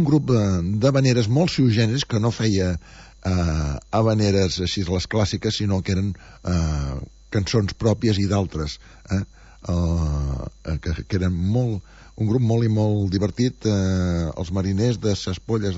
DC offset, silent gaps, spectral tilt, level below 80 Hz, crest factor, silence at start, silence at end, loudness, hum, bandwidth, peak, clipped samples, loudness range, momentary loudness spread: under 0.1%; none; -6.5 dB/octave; -36 dBFS; 16 dB; 0 s; 0 s; -22 LUFS; none; 8 kHz; -6 dBFS; under 0.1%; 4 LU; 10 LU